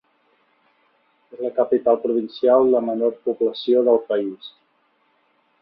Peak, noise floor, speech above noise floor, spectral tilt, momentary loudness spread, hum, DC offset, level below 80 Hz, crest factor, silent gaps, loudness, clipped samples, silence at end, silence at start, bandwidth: -4 dBFS; -64 dBFS; 45 dB; -8.5 dB/octave; 12 LU; none; under 0.1%; -68 dBFS; 18 dB; none; -20 LUFS; under 0.1%; 1.1 s; 1.35 s; 5.4 kHz